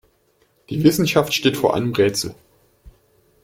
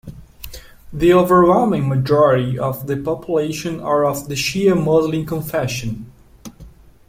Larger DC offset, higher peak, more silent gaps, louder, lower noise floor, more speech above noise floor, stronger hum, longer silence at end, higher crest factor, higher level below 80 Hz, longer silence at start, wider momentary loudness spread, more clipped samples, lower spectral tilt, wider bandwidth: neither; about the same, -2 dBFS vs -2 dBFS; neither; about the same, -19 LUFS vs -17 LUFS; first, -61 dBFS vs -42 dBFS; first, 43 dB vs 26 dB; neither; first, 0.55 s vs 0.4 s; about the same, 18 dB vs 16 dB; second, -52 dBFS vs -42 dBFS; first, 0.7 s vs 0.05 s; second, 10 LU vs 17 LU; neither; about the same, -5 dB/octave vs -6 dB/octave; about the same, 16.5 kHz vs 16.5 kHz